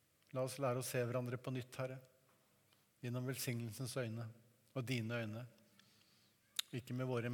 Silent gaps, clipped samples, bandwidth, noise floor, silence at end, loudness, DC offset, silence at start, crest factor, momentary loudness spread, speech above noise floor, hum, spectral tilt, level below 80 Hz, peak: none; under 0.1%; 19 kHz; -75 dBFS; 0 s; -44 LUFS; under 0.1%; 0.35 s; 26 dB; 10 LU; 32 dB; none; -5 dB/octave; -86 dBFS; -20 dBFS